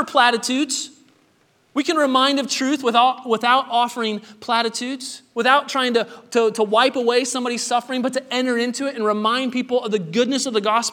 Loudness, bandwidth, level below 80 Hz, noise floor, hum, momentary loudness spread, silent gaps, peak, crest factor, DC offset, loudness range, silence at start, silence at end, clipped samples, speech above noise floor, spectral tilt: -20 LUFS; 17.5 kHz; -78 dBFS; -60 dBFS; none; 8 LU; none; 0 dBFS; 20 dB; under 0.1%; 2 LU; 0 s; 0 s; under 0.1%; 40 dB; -2.5 dB/octave